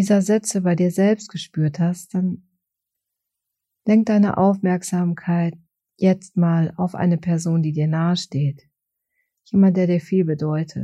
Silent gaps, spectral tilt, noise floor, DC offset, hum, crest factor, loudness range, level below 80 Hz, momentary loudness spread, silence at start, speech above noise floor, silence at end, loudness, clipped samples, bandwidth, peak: none; -7 dB/octave; -82 dBFS; under 0.1%; none; 14 dB; 3 LU; -64 dBFS; 8 LU; 0 s; 63 dB; 0 s; -20 LUFS; under 0.1%; 12.5 kHz; -6 dBFS